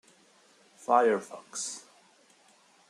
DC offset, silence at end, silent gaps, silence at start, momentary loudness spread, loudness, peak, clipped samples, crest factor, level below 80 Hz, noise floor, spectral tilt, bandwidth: under 0.1%; 1.1 s; none; 0.9 s; 18 LU; -29 LUFS; -8 dBFS; under 0.1%; 24 dB; -90 dBFS; -62 dBFS; -2.5 dB/octave; 13 kHz